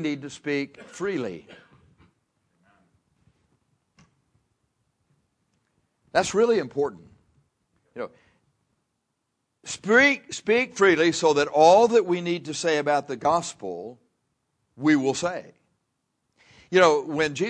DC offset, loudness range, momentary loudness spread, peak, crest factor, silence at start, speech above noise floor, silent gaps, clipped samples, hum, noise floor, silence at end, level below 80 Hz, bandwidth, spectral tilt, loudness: under 0.1%; 15 LU; 19 LU; -4 dBFS; 22 dB; 0 s; 56 dB; none; under 0.1%; none; -78 dBFS; 0 s; -66 dBFS; 10.5 kHz; -4 dB/octave; -22 LUFS